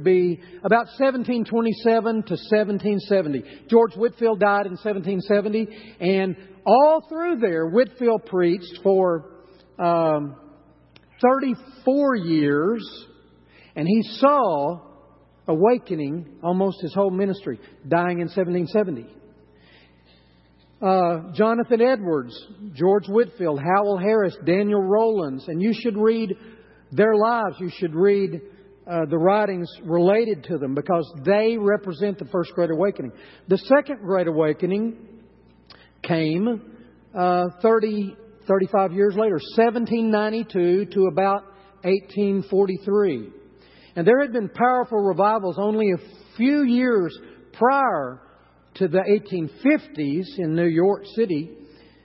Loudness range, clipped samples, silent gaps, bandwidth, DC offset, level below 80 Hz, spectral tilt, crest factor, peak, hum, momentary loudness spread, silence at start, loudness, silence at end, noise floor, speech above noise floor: 3 LU; under 0.1%; none; 5.8 kHz; under 0.1%; -64 dBFS; -11.5 dB/octave; 18 dB; -4 dBFS; none; 10 LU; 0 s; -21 LUFS; 0.4 s; -56 dBFS; 35 dB